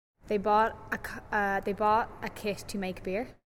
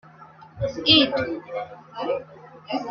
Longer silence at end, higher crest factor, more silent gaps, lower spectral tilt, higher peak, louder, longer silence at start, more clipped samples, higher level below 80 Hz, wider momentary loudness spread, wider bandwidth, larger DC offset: first, 0.15 s vs 0 s; second, 18 dB vs 24 dB; neither; about the same, -5 dB/octave vs -5.5 dB/octave; second, -14 dBFS vs -2 dBFS; second, -30 LUFS vs -22 LUFS; about the same, 0.25 s vs 0.2 s; neither; about the same, -52 dBFS vs -54 dBFS; second, 10 LU vs 18 LU; first, 17 kHz vs 6.8 kHz; neither